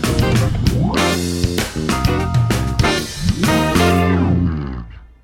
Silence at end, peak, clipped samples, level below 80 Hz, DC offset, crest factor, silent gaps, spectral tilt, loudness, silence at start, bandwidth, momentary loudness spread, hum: 0.2 s; -2 dBFS; under 0.1%; -26 dBFS; under 0.1%; 16 dB; none; -5.5 dB/octave; -17 LUFS; 0 s; 17 kHz; 6 LU; none